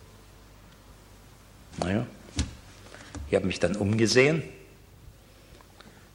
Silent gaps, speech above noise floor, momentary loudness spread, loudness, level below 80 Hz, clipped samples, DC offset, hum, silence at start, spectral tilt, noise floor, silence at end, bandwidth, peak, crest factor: none; 27 dB; 25 LU; -26 LUFS; -48 dBFS; under 0.1%; under 0.1%; none; 1.7 s; -5 dB/octave; -52 dBFS; 1.5 s; 16.5 kHz; -6 dBFS; 24 dB